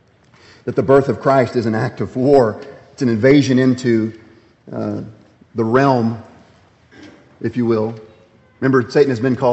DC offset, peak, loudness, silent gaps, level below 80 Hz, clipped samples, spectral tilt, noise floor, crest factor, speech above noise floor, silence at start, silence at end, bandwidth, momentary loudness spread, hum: under 0.1%; 0 dBFS; -16 LUFS; none; -54 dBFS; under 0.1%; -7.5 dB/octave; -50 dBFS; 16 dB; 35 dB; 0.65 s; 0 s; 8.2 kHz; 17 LU; none